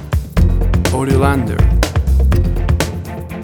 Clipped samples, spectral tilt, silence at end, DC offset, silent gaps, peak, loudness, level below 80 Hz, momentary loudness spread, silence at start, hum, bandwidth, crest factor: under 0.1%; -6.5 dB/octave; 0 s; under 0.1%; none; 0 dBFS; -15 LUFS; -16 dBFS; 5 LU; 0 s; none; 18.5 kHz; 14 dB